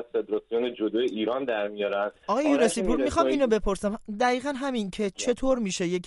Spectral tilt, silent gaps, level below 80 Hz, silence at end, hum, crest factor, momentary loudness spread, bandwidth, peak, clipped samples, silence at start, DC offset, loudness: -4.5 dB/octave; none; -44 dBFS; 0 s; none; 16 dB; 6 LU; 11.5 kHz; -10 dBFS; under 0.1%; 0 s; under 0.1%; -26 LUFS